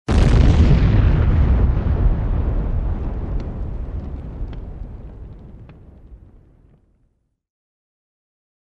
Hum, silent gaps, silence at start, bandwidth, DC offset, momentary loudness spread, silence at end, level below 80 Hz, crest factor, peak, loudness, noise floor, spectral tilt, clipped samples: none; none; 0.1 s; 8.6 kHz; under 0.1%; 22 LU; 2.5 s; -22 dBFS; 18 dB; -2 dBFS; -19 LUFS; -64 dBFS; -8 dB/octave; under 0.1%